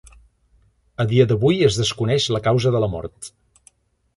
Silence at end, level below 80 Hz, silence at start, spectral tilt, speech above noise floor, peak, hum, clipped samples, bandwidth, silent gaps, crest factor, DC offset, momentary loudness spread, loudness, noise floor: 0.9 s; -46 dBFS; 1 s; -5.5 dB/octave; 41 dB; -2 dBFS; none; under 0.1%; 11.5 kHz; none; 18 dB; under 0.1%; 19 LU; -19 LUFS; -59 dBFS